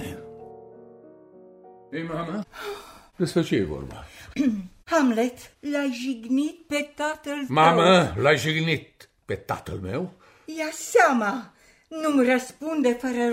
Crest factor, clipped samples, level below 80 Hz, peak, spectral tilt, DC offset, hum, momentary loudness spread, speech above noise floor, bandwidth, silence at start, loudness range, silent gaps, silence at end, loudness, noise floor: 20 dB; under 0.1%; -54 dBFS; -4 dBFS; -5 dB/octave; under 0.1%; none; 18 LU; 26 dB; 16 kHz; 0 s; 8 LU; none; 0 s; -24 LUFS; -50 dBFS